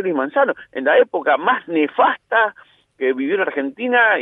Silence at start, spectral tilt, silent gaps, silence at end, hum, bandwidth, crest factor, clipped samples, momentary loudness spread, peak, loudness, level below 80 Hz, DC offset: 0 s; -7 dB/octave; none; 0 s; none; 3.9 kHz; 16 dB; under 0.1%; 7 LU; -2 dBFS; -18 LUFS; -74 dBFS; under 0.1%